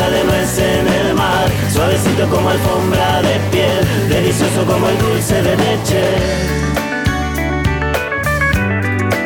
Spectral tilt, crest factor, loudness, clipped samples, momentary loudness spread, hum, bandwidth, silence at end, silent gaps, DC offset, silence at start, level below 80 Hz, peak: -5 dB/octave; 10 dB; -14 LUFS; under 0.1%; 3 LU; none; 18.5 kHz; 0 s; none; under 0.1%; 0 s; -28 dBFS; -4 dBFS